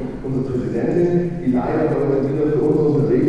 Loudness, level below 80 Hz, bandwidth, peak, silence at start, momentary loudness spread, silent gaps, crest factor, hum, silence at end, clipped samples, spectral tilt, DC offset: -19 LUFS; -40 dBFS; 10 kHz; -6 dBFS; 0 s; 6 LU; none; 12 dB; none; 0 s; under 0.1%; -10 dB/octave; under 0.1%